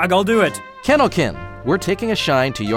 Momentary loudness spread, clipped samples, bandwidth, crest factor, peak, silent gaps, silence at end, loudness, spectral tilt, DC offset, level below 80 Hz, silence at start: 7 LU; under 0.1%; 17 kHz; 16 dB; -2 dBFS; none; 0 s; -18 LUFS; -5 dB/octave; under 0.1%; -42 dBFS; 0 s